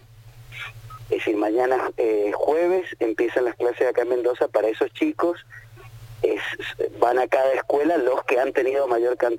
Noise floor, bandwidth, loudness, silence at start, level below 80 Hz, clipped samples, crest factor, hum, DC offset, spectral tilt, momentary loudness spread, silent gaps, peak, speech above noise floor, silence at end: -46 dBFS; 17 kHz; -22 LUFS; 0.2 s; -56 dBFS; under 0.1%; 18 dB; none; under 0.1%; -5.5 dB/octave; 12 LU; none; -4 dBFS; 24 dB; 0 s